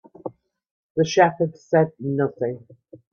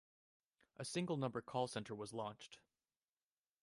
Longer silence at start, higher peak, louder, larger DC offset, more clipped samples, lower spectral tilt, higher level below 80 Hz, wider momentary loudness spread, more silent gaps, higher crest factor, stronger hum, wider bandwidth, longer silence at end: second, 0.25 s vs 0.8 s; first, -2 dBFS vs -26 dBFS; first, -22 LUFS vs -45 LUFS; neither; neither; about the same, -6 dB/octave vs -5 dB/octave; first, -66 dBFS vs -82 dBFS; first, 20 LU vs 16 LU; first, 0.71-0.95 s vs none; about the same, 20 dB vs 20 dB; neither; second, 7 kHz vs 11.5 kHz; second, 0.15 s vs 1.05 s